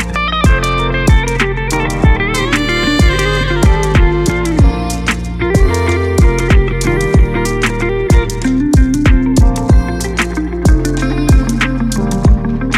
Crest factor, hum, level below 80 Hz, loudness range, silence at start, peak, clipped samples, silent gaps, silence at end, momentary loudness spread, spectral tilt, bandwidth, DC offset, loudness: 10 dB; none; -14 dBFS; 1 LU; 0 s; 0 dBFS; under 0.1%; none; 0 s; 5 LU; -5.5 dB/octave; 14.5 kHz; under 0.1%; -13 LUFS